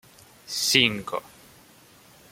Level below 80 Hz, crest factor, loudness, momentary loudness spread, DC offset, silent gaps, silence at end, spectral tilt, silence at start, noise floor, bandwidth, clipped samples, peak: -64 dBFS; 26 dB; -23 LUFS; 15 LU; under 0.1%; none; 1.1 s; -2 dB/octave; 0.45 s; -54 dBFS; 16.5 kHz; under 0.1%; -2 dBFS